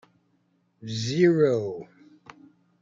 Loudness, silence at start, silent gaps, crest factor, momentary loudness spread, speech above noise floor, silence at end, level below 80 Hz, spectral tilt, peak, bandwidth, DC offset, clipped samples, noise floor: -24 LUFS; 0.8 s; none; 18 dB; 19 LU; 45 dB; 1 s; -68 dBFS; -6.5 dB/octave; -8 dBFS; 7.6 kHz; under 0.1%; under 0.1%; -69 dBFS